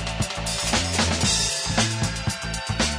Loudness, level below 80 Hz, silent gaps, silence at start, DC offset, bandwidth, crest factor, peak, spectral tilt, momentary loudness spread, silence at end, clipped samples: -23 LUFS; -36 dBFS; none; 0 s; under 0.1%; 11 kHz; 18 dB; -6 dBFS; -3 dB/octave; 7 LU; 0 s; under 0.1%